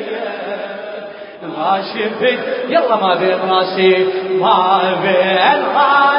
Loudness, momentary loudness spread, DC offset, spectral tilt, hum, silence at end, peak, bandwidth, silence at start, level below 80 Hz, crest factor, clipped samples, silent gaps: -14 LUFS; 14 LU; under 0.1%; -9.5 dB/octave; none; 0 s; 0 dBFS; 5.4 kHz; 0 s; -64 dBFS; 14 dB; under 0.1%; none